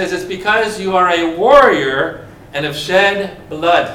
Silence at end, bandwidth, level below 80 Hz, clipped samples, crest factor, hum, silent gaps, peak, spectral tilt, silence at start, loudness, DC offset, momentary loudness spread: 0 s; 16 kHz; -44 dBFS; 0.2%; 14 dB; none; none; 0 dBFS; -4 dB/octave; 0 s; -13 LUFS; under 0.1%; 13 LU